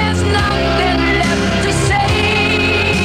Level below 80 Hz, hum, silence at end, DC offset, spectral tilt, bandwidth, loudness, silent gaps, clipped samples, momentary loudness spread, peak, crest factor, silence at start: -26 dBFS; none; 0 s; 0.2%; -4.5 dB/octave; 15 kHz; -14 LUFS; none; under 0.1%; 2 LU; -2 dBFS; 10 dB; 0 s